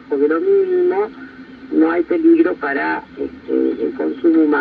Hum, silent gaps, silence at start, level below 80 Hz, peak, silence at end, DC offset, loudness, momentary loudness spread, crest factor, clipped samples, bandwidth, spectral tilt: none; none; 0 s; -56 dBFS; -4 dBFS; 0 s; under 0.1%; -17 LUFS; 12 LU; 14 dB; under 0.1%; 4.7 kHz; -8.5 dB/octave